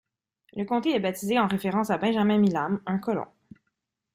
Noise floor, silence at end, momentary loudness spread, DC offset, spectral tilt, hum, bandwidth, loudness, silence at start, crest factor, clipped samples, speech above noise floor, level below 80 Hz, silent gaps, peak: -80 dBFS; 0.9 s; 10 LU; under 0.1%; -6.5 dB/octave; none; 16 kHz; -26 LUFS; 0.55 s; 16 dB; under 0.1%; 55 dB; -66 dBFS; none; -12 dBFS